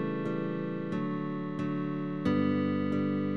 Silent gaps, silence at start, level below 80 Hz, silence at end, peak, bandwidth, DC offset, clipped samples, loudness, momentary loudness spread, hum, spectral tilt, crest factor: none; 0 s; -64 dBFS; 0 s; -16 dBFS; 6.6 kHz; 0.2%; under 0.1%; -32 LUFS; 6 LU; none; -9 dB/octave; 14 dB